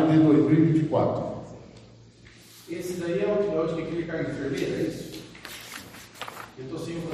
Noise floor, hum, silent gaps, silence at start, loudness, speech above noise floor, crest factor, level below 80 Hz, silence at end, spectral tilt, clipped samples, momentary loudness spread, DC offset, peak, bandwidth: -51 dBFS; none; none; 0 s; -25 LUFS; 25 dB; 16 dB; -56 dBFS; 0 s; -7.5 dB/octave; under 0.1%; 21 LU; under 0.1%; -10 dBFS; 14 kHz